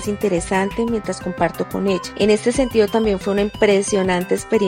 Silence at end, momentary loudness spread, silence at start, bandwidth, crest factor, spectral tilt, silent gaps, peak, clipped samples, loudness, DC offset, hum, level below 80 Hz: 0 s; 6 LU; 0 s; 17 kHz; 16 dB; -5 dB/octave; none; -2 dBFS; under 0.1%; -19 LUFS; under 0.1%; none; -40 dBFS